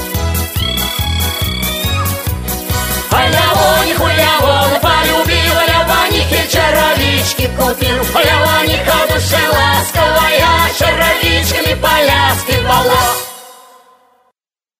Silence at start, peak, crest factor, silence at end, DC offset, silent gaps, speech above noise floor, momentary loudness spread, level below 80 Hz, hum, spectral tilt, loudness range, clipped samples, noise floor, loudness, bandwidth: 0 s; 0 dBFS; 12 dB; 1.25 s; under 0.1%; none; 58 dB; 6 LU; -24 dBFS; none; -3.5 dB/octave; 3 LU; under 0.1%; -70 dBFS; -11 LUFS; 16 kHz